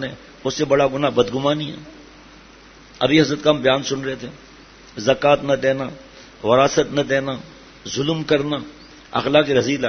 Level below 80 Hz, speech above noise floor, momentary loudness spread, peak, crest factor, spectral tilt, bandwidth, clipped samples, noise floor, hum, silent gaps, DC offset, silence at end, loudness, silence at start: -50 dBFS; 26 dB; 15 LU; 0 dBFS; 20 dB; -5 dB/octave; 6.6 kHz; under 0.1%; -45 dBFS; none; none; under 0.1%; 0 s; -19 LUFS; 0 s